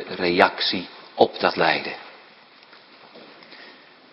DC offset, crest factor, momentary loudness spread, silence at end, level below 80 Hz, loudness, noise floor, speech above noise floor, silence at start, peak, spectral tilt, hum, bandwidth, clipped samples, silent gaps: under 0.1%; 24 dB; 25 LU; 0.4 s; -64 dBFS; -21 LUFS; -50 dBFS; 29 dB; 0 s; 0 dBFS; -6 dB/octave; none; 11 kHz; under 0.1%; none